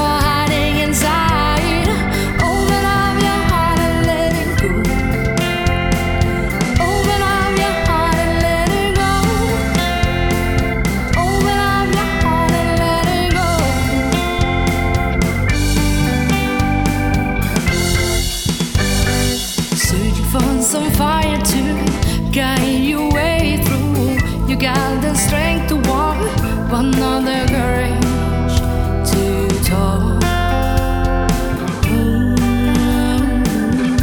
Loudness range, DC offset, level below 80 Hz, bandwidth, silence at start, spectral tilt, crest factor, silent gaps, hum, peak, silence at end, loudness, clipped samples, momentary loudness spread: 1 LU; under 0.1%; -22 dBFS; over 20 kHz; 0 s; -5 dB/octave; 14 dB; none; none; 0 dBFS; 0 s; -16 LUFS; under 0.1%; 2 LU